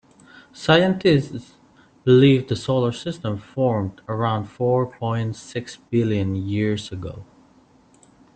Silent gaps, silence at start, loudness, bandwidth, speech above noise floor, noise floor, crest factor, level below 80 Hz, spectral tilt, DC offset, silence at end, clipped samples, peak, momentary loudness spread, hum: none; 0.55 s; -21 LUFS; 9 kHz; 34 dB; -54 dBFS; 20 dB; -54 dBFS; -7 dB/octave; under 0.1%; 1.1 s; under 0.1%; -2 dBFS; 16 LU; none